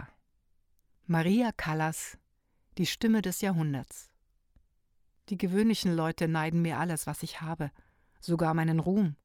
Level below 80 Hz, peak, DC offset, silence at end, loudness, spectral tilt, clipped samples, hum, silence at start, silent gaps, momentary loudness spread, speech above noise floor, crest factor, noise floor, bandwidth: -60 dBFS; -16 dBFS; under 0.1%; 0.1 s; -30 LUFS; -6 dB/octave; under 0.1%; none; 0 s; none; 13 LU; 42 dB; 16 dB; -72 dBFS; 17 kHz